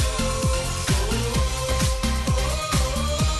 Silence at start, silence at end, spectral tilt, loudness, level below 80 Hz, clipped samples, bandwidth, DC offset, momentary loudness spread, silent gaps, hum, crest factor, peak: 0 s; 0 s; -4 dB/octave; -23 LUFS; -26 dBFS; under 0.1%; 12.5 kHz; under 0.1%; 1 LU; none; none; 12 dB; -10 dBFS